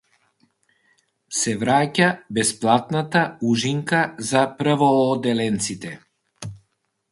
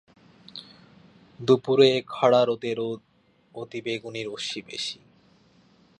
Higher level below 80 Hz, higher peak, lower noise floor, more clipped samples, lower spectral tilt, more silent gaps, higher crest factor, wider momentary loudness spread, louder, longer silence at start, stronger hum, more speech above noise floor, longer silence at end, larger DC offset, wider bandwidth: first, -60 dBFS vs -70 dBFS; first, -2 dBFS vs -6 dBFS; first, -71 dBFS vs -59 dBFS; neither; about the same, -4.5 dB/octave vs -5 dB/octave; neither; about the same, 20 dB vs 22 dB; second, 18 LU vs 23 LU; first, -20 LUFS vs -24 LUFS; first, 1.3 s vs 0.55 s; neither; first, 50 dB vs 35 dB; second, 0.55 s vs 1.05 s; neither; first, 11.5 kHz vs 10 kHz